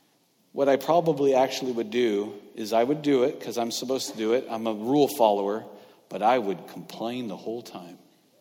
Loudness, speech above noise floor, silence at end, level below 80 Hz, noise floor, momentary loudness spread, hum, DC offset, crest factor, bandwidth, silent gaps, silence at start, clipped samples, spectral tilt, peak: -26 LUFS; 40 dB; 0.45 s; -74 dBFS; -65 dBFS; 15 LU; none; under 0.1%; 20 dB; 18 kHz; none; 0.55 s; under 0.1%; -5 dB/octave; -6 dBFS